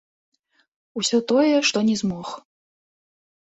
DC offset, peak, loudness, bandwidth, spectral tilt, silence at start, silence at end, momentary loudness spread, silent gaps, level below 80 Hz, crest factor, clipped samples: under 0.1%; -6 dBFS; -20 LUFS; 8.2 kHz; -4 dB/octave; 0.95 s; 1 s; 18 LU; none; -64 dBFS; 18 dB; under 0.1%